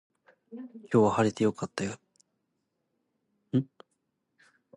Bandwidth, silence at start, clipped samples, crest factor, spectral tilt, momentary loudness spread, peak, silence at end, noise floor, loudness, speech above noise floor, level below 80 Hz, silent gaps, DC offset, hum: 11 kHz; 0.5 s; under 0.1%; 22 dB; -6.5 dB/octave; 21 LU; -10 dBFS; 1.15 s; -80 dBFS; -28 LUFS; 52 dB; -66 dBFS; none; under 0.1%; none